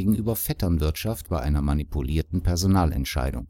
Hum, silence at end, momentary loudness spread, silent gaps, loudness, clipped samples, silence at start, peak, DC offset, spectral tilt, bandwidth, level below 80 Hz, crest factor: none; 0 s; 6 LU; none; -25 LUFS; under 0.1%; 0 s; -8 dBFS; under 0.1%; -6 dB/octave; 17 kHz; -30 dBFS; 16 dB